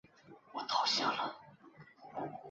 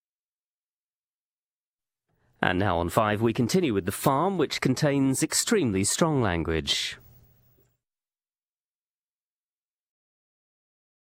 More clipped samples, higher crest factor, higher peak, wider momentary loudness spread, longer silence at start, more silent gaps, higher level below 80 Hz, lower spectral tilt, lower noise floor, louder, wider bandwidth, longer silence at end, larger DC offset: neither; about the same, 22 dB vs 24 dB; second, -18 dBFS vs -6 dBFS; first, 19 LU vs 4 LU; second, 0.25 s vs 2.4 s; neither; second, -82 dBFS vs -52 dBFS; second, -0.5 dB/octave vs -4.5 dB/octave; second, -60 dBFS vs under -90 dBFS; second, -35 LUFS vs -25 LUFS; second, 7.6 kHz vs 16 kHz; second, 0 s vs 4.1 s; neither